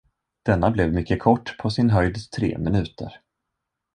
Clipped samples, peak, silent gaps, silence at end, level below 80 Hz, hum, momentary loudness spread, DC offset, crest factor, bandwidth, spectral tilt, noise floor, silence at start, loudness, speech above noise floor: under 0.1%; -2 dBFS; none; 0.8 s; -38 dBFS; none; 10 LU; under 0.1%; 20 dB; 10 kHz; -7.5 dB/octave; -82 dBFS; 0.45 s; -22 LUFS; 60 dB